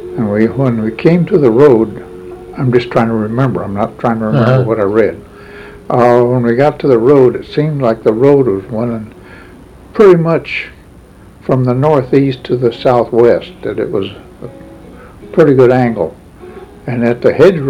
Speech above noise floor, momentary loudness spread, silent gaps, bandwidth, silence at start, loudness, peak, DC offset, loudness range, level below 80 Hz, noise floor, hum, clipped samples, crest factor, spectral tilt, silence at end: 27 dB; 19 LU; none; 10.5 kHz; 0 s; -11 LUFS; 0 dBFS; under 0.1%; 3 LU; -42 dBFS; -38 dBFS; none; 0.3%; 12 dB; -9 dB/octave; 0 s